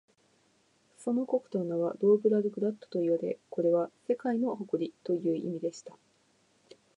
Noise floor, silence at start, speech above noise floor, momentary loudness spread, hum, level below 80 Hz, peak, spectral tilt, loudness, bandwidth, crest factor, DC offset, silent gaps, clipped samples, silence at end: -69 dBFS; 1 s; 39 dB; 10 LU; none; -84 dBFS; -14 dBFS; -8 dB/octave; -31 LUFS; 10.5 kHz; 18 dB; under 0.1%; none; under 0.1%; 1.05 s